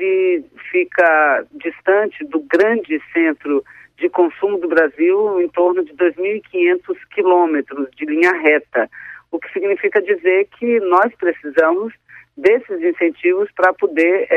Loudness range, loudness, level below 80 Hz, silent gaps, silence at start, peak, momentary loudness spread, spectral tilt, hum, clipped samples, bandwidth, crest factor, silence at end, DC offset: 1 LU; -16 LUFS; -64 dBFS; none; 0 s; -2 dBFS; 8 LU; -6 dB/octave; none; under 0.1%; 6 kHz; 14 dB; 0 s; under 0.1%